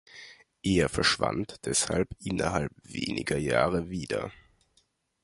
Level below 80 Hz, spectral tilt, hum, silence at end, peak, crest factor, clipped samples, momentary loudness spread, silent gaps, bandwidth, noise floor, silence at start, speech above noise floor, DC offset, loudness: -48 dBFS; -4 dB/octave; none; 0.9 s; -8 dBFS; 22 dB; under 0.1%; 10 LU; none; 11.5 kHz; -70 dBFS; 0.15 s; 42 dB; under 0.1%; -29 LUFS